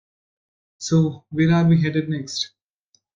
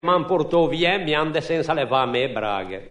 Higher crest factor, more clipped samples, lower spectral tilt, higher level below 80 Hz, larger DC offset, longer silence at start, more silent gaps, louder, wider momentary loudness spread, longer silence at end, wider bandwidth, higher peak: about the same, 16 dB vs 16 dB; neither; about the same, -6 dB/octave vs -6 dB/octave; second, -56 dBFS vs -50 dBFS; neither; first, 0.8 s vs 0.05 s; neither; about the same, -21 LUFS vs -21 LUFS; first, 11 LU vs 5 LU; first, 0.7 s vs 0 s; second, 7.6 kHz vs 10 kHz; about the same, -6 dBFS vs -6 dBFS